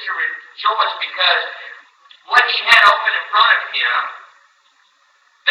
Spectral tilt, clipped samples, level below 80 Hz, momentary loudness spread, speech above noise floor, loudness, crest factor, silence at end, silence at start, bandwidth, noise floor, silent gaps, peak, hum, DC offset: 1.5 dB/octave; under 0.1%; -66 dBFS; 14 LU; 41 dB; -14 LUFS; 18 dB; 0 s; 0 s; 17 kHz; -57 dBFS; none; 0 dBFS; none; under 0.1%